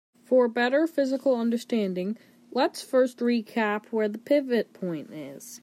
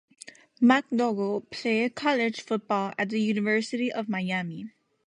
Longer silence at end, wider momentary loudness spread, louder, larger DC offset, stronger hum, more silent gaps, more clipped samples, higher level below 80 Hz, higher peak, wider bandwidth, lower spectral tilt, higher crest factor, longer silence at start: second, 0.05 s vs 0.4 s; second, 11 LU vs 16 LU; about the same, -26 LUFS vs -27 LUFS; neither; neither; neither; neither; second, -82 dBFS vs -74 dBFS; second, -12 dBFS vs -8 dBFS; first, 15.5 kHz vs 10.5 kHz; about the same, -5.5 dB/octave vs -5.5 dB/octave; second, 14 dB vs 20 dB; about the same, 0.3 s vs 0.25 s